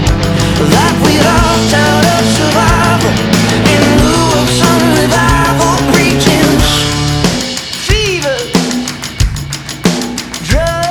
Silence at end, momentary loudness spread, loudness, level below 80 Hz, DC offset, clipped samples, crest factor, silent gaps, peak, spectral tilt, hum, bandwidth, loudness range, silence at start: 0 s; 7 LU; -10 LUFS; -22 dBFS; under 0.1%; under 0.1%; 10 dB; none; 0 dBFS; -4.5 dB/octave; none; 20 kHz; 5 LU; 0 s